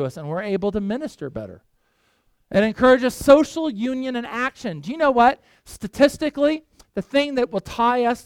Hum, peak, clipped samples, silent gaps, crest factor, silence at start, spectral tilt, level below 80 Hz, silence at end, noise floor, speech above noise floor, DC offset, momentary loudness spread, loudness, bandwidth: none; -2 dBFS; under 0.1%; none; 20 dB; 0 s; -5.5 dB/octave; -50 dBFS; 0.05 s; -65 dBFS; 45 dB; under 0.1%; 17 LU; -20 LUFS; 17 kHz